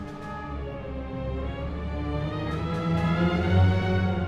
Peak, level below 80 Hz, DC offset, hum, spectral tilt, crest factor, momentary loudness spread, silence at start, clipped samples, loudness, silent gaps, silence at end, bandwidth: -10 dBFS; -38 dBFS; under 0.1%; none; -8 dB/octave; 16 dB; 13 LU; 0 s; under 0.1%; -28 LUFS; none; 0 s; 7.2 kHz